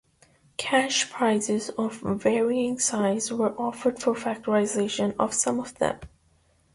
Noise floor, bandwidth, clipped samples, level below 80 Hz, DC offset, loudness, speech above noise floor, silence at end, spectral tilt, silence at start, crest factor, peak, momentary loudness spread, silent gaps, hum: -64 dBFS; 11.5 kHz; under 0.1%; -60 dBFS; under 0.1%; -25 LUFS; 38 dB; 0.7 s; -3.5 dB/octave; 0.6 s; 18 dB; -8 dBFS; 5 LU; none; none